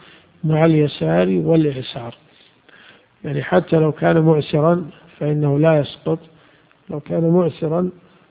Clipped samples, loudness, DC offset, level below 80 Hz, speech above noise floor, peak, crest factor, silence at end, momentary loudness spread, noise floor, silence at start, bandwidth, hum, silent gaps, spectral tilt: under 0.1%; -18 LUFS; under 0.1%; -54 dBFS; 36 dB; 0 dBFS; 18 dB; 0.4 s; 14 LU; -53 dBFS; 0.45 s; 4.8 kHz; none; none; -13 dB/octave